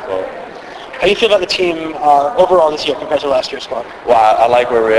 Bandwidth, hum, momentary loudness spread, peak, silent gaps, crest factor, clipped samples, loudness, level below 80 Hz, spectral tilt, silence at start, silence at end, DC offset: 11 kHz; none; 14 LU; 0 dBFS; none; 14 dB; under 0.1%; -13 LUFS; -46 dBFS; -4 dB/octave; 0 s; 0 s; under 0.1%